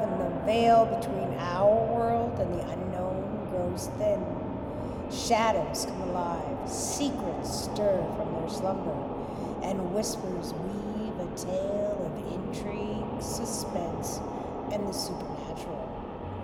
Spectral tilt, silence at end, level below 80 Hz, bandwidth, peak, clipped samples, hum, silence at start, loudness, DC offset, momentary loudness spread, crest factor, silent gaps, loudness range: -5 dB/octave; 0 s; -48 dBFS; 17 kHz; -12 dBFS; under 0.1%; none; 0 s; -30 LUFS; under 0.1%; 10 LU; 18 dB; none; 6 LU